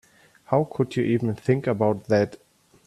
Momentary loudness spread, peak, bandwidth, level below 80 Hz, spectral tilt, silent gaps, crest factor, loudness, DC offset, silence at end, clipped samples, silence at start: 3 LU; -6 dBFS; 13 kHz; -60 dBFS; -8 dB/octave; none; 18 dB; -24 LUFS; under 0.1%; 0.5 s; under 0.1%; 0.5 s